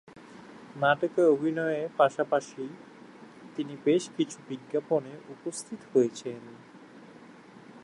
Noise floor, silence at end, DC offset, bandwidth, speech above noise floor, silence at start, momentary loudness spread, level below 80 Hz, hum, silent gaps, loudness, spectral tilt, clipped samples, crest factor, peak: -51 dBFS; 0 s; under 0.1%; 11.5 kHz; 22 dB; 0.15 s; 25 LU; -78 dBFS; none; none; -29 LUFS; -5 dB/octave; under 0.1%; 20 dB; -10 dBFS